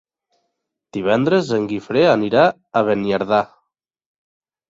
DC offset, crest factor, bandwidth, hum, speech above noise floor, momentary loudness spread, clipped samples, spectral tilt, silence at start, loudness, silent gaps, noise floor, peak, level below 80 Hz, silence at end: under 0.1%; 18 dB; 7.8 kHz; none; 58 dB; 7 LU; under 0.1%; -6.5 dB/octave; 0.95 s; -18 LUFS; none; -75 dBFS; -2 dBFS; -58 dBFS; 1.25 s